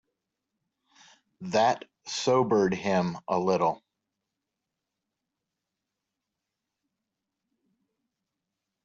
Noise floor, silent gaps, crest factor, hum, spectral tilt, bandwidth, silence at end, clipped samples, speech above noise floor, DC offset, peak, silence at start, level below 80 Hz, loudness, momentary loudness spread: -86 dBFS; none; 20 dB; none; -4.5 dB/octave; 8 kHz; 5.05 s; under 0.1%; 60 dB; under 0.1%; -12 dBFS; 1.4 s; -70 dBFS; -27 LUFS; 11 LU